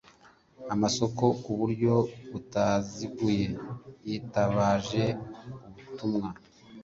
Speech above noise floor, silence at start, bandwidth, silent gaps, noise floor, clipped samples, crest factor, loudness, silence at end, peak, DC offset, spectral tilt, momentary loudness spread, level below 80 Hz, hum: 30 dB; 0.6 s; 7.8 kHz; none; -59 dBFS; under 0.1%; 20 dB; -29 LUFS; 0 s; -10 dBFS; under 0.1%; -6 dB/octave; 17 LU; -56 dBFS; none